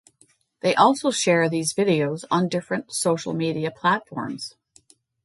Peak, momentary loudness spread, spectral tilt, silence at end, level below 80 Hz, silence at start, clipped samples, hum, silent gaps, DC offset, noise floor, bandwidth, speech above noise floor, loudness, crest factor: -2 dBFS; 12 LU; -4.5 dB/octave; 0.75 s; -68 dBFS; 0.65 s; under 0.1%; none; none; under 0.1%; -61 dBFS; 12 kHz; 39 dB; -22 LUFS; 22 dB